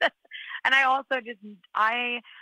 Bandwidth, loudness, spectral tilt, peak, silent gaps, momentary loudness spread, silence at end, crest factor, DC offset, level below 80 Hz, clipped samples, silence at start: 14 kHz; -24 LUFS; -2 dB/octave; -8 dBFS; none; 20 LU; 0 s; 18 dB; under 0.1%; -74 dBFS; under 0.1%; 0 s